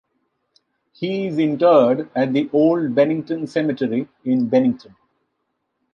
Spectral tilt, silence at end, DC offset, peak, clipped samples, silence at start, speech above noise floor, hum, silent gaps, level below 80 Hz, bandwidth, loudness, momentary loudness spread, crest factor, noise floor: -8 dB/octave; 1.15 s; under 0.1%; -2 dBFS; under 0.1%; 1 s; 56 dB; none; none; -68 dBFS; 7 kHz; -19 LUFS; 10 LU; 18 dB; -74 dBFS